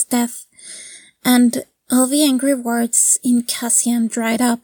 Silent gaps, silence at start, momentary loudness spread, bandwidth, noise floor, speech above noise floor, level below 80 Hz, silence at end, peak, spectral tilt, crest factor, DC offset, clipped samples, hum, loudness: none; 0 s; 19 LU; 19 kHz; -39 dBFS; 23 dB; -70 dBFS; 0.05 s; -2 dBFS; -2 dB/octave; 16 dB; under 0.1%; under 0.1%; none; -16 LUFS